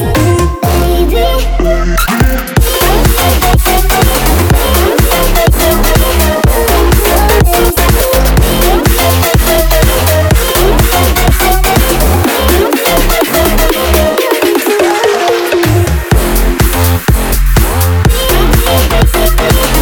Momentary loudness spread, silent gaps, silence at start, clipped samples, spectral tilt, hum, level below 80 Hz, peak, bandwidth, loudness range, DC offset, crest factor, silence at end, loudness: 3 LU; none; 0 s; 0.2%; -4.5 dB/octave; none; -12 dBFS; 0 dBFS; over 20 kHz; 1 LU; under 0.1%; 8 dB; 0 s; -9 LUFS